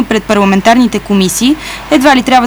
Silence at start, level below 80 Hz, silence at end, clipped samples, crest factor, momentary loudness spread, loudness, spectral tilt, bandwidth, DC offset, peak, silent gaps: 0 s; -34 dBFS; 0 s; 1%; 8 dB; 5 LU; -9 LUFS; -4.5 dB/octave; over 20 kHz; under 0.1%; 0 dBFS; none